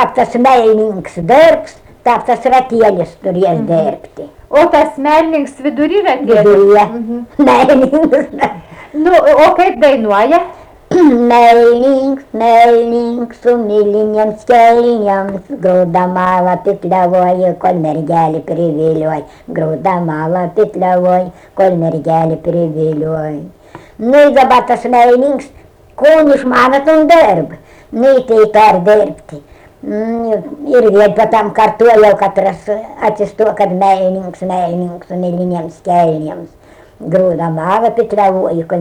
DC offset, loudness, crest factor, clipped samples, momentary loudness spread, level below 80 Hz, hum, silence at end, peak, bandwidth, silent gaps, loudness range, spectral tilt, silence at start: under 0.1%; -10 LUFS; 10 dB; under 0.1%; 11 LU; -46 dBFS; none; 0 s; 0 dBFS; 16.5 kHz; none; 5 LU; -7 dB/octave; 0 s